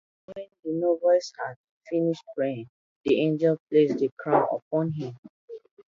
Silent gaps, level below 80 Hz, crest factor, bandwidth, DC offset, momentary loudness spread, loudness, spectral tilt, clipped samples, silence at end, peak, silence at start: 1.56-1.64 s, 1.71-1.81 s, 2.69-3.01 s, 3.60-3.66 s, 4.12-4.17 s, 4.62-4.71 s, 5.19-5.23 s, 5.29-5.48 s; -72 dBFS; 20 dB; 7.6 kHz; under 0.1%; 19 LU; -26 LUFS; -7 dB/octave; under 0.1%; 0.35 s; -6 dBFS; 0.3 s